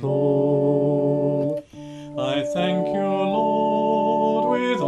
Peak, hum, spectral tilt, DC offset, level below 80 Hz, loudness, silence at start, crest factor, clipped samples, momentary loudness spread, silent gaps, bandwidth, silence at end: -8 dBFS; none; -7.5 dB/octave; under 0.1%; -62 dBFS; -21 LUFS; 0 s; 12 dB; under 0.1%; 8 LU; none; 11 kHz; 0 s